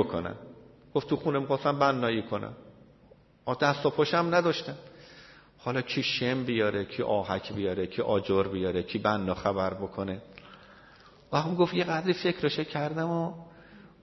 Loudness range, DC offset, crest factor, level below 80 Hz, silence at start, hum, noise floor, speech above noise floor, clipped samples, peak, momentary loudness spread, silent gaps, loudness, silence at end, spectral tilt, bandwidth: 2 LU; under 0.1%; 20 dB; -62 dBFS; 0 s; none; -58 dBFS; 30 dB; under 0.1%; -10 dBFS; 14 LU; none; -29 LUFS; 0.15 s; -6.5 dB/octave; 6.2 kHz